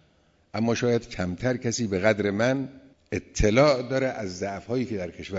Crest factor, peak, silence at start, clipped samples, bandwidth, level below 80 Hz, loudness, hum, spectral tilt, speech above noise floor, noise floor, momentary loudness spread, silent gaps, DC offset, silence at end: 18 dB; -8 dBFS; 0.55 s; under 0.1%; 8 kHz; -42 dBFS; -26 LUFS; none; -5.5 dB/octave; 38 dB; -63 dBFS; 12 LU; none; under 0.1%; 0 s